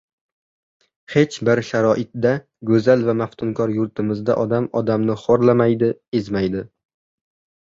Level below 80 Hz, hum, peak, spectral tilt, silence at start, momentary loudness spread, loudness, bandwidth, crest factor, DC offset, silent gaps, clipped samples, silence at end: -54 dBFS; none; -2 dBFS; -7.5 dB/octave; 1.1 s; 8 LU; -19 LUFS; 7.6 kHz; 18 dB; under 0.1%; 6.08-6.12 s; under 0.1%; 1.1 s